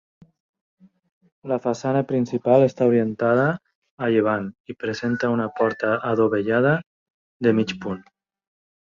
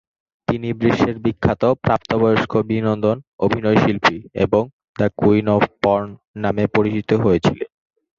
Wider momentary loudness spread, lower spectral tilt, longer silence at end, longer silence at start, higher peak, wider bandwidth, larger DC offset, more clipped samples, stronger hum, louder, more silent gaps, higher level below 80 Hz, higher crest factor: first, 12 LU vs 7 LU; about the same, -7.5 dB/octave vs -7.5 dB/octave; first, 0.8 s vs 0.5 s; first, 1.45 s vs 0.5 s; about the same, -4 dBFS vs -2 dBFS; about the same, 7.4 kHz vs 7.4 kHz; neither; neither; neither; second, -22 LUFS vs -18 LUFS; first, 3.75-3.82 s, 3.91-3.98 s, 4.60-4.64 s, 6.86-7.40 s vs 3.27-3.39 s, 4.73-4.94 s, 6.27-6.34 s; second, -62 dBFS vs -44 dBFS; about the same, 18 dB vs 16 dB